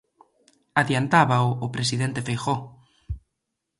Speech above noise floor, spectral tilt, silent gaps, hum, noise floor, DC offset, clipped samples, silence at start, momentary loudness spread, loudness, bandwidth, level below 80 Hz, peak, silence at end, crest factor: 58 dB; -5 dB/octave; none; none; -81 dBFS; under 0.1%; under 0.1%; 0.75 s; 20 LU; -23 LUFS; 11.5 kHz; -48 dBFS; -4 dBFS; 0.6 s; 22 dB